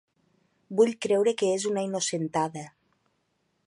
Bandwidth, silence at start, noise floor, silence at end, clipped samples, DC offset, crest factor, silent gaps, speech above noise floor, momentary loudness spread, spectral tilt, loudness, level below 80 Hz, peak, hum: 11.5 kHz; 0.7 s; -74 dBFS; 1 s; under 0.1%; under 0.1%; 18 dB; none; 48 dB; 9 LU; -4 dB/octave; -26 LUFS; -76 dBFS; -10 dBFS; none